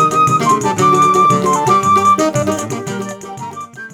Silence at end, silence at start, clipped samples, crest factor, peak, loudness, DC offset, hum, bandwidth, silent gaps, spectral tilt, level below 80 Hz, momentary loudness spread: 0.05 s; 0 s; under 0.1%; 12 dB; -2 dBFS; -12 LUFS; under 0.1%; none; 17 kHz; none; -5 dB/octave; -52 dBFS; 17 LU